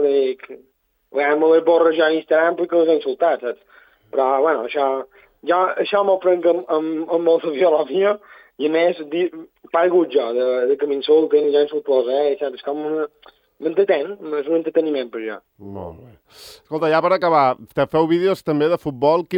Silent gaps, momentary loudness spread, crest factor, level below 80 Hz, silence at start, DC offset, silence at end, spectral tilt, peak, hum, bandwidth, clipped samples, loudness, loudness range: none; 12 LU; 16 dB; -64 dBFS; 0 s; under 0.1%; 0 s; -7 dB/octave; -4 dBFS; none; 9.2 kHz; under 0.1%; -19 LUFS; 5 LU